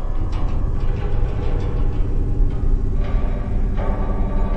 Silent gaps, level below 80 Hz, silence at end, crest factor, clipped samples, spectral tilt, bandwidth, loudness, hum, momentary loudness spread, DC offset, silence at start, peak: none; -18 dBFS; 0 s; 12 dB; under 0.1%; -9 dB/octave; 4.1 kHz; -24 LUFS; none; 2 LU; under 0.1%; 0 s; -6 dBFS